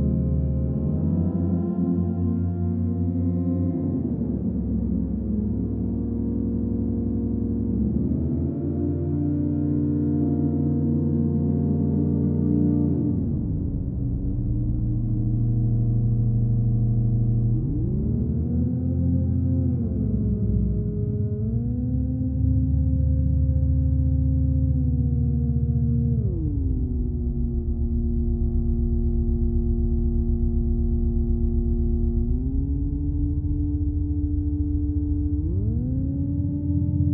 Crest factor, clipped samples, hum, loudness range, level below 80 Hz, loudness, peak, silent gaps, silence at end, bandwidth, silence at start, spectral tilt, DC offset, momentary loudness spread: 12 dB; under 0.1%; none; 3 LU; -28 dBFS; -24 LUFS; -10 dBFS; none; 0 s; 1.7 kHz; 0 s; -16 dB/octave; under 0.1%; 4 LU